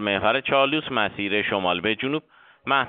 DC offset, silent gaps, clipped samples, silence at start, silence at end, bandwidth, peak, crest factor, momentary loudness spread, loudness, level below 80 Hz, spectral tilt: under 0.1%; none; under 0.1%; 0 s; 0 s; 4.7 kHz; -6 dBFS; 18 dB; 7 LU; -23 LUFS; -58 dBFS; -1.5 dB/octave